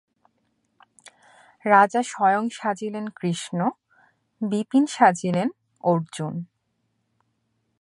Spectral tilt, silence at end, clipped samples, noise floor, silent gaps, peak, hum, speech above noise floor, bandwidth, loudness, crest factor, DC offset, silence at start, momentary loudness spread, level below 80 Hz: -5.5 dB/octave; 1.35 s; under 0.1%; -73 dBFS; none; -2 dBFS; none; 51 dB; 11.5 kHz; -23 LUFS; 22 dB; under 0.1%; 1.65 s; 14 LU; -74 dBFS